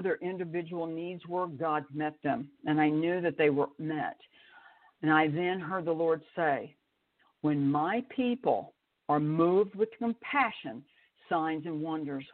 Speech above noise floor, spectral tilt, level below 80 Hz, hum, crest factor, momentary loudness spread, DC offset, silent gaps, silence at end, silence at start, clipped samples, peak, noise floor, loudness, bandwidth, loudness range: 42 dB; -5 dB/octave; -76 dBFS; none; 20 dB; 10 LU; under 0.1%; none; 0.1 s; 0 s; under 0.1%; -12 dBFS; -72 dBFS; -31 LUFS; 4.4 kHz; 2 LU